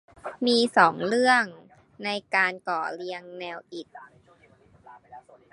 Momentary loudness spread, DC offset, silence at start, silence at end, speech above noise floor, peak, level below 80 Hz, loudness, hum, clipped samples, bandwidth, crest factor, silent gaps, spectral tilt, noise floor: 19 LU; under 0.1%; 0.25 s; 0.35 s; 33 dB; -2 dBFS; -72 dBFS; -24 LUFS; none; under 0.1%; 11.5 kHz; 24 dB; none; -3.5 dB/octave; -58 dBFS